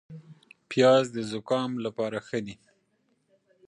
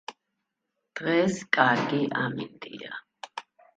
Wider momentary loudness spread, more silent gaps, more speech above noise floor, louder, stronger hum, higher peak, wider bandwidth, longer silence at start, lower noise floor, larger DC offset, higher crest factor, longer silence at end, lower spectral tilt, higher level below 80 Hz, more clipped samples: about the same, 20 LU vs 19 LU; neither; second, 45 dB vs 55 dB; about the same, -26 LUFS vs -25 LUFS; neither; second, -8 dBFS vs -4 dBFS; first, 10.5 kHz vs 9.2 kHz; about the same, 0.1 s vs 0.1 s; second, -72 dBFS vs -82 dBFS; neither; about the same, 20 dB vs 24 dB; first, 1.15 s vs 0.35 s; about the same, -5.5 dB/octave vs -5 dB/octave; about the same, -72 dBFS vs -72 dBFS; neither